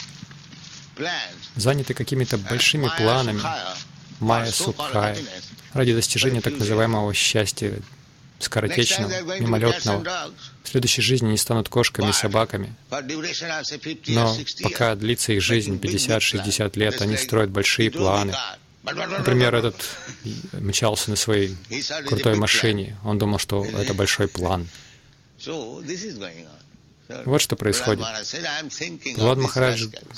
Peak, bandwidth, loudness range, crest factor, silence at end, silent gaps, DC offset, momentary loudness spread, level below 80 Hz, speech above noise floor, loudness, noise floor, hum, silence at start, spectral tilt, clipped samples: -4 dBFS; 16.5 kHz; 4 LU; 20 dB; 0 s; none; under 0.1%; 13 LU; -50 dBFS; 29 dB; -22 LUFS; -52 dBFS; none; 0 s; -4 dB/octave; under 0.1%